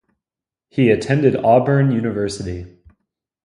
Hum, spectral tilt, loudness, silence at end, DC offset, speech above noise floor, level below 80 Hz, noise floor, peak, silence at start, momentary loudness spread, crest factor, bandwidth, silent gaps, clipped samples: none; -7.5 dB/octave; -17 LUFS; 0.8 s; under 0.1%; 72 dB; -46 dBFS; -88 dBFS; 0 dBFS; 0.75 s; 14 LU; 18 dB; 11 kHz; none; under 0.1%